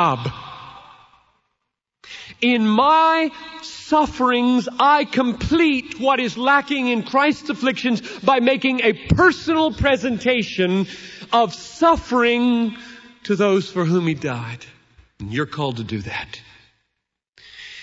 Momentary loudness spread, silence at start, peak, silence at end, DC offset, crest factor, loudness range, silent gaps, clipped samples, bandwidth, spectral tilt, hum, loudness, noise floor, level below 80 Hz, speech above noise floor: 18 LU; 0 s; -2 dBFS; 0 s; under 0.1%; 18 dB; 5 LU; 17.29-17.33 s; under 0.1%; 8 kHz; -5.5 dB/octave; none; -19 LUFS; -78 dBFS; -44 dBFS; 59 dB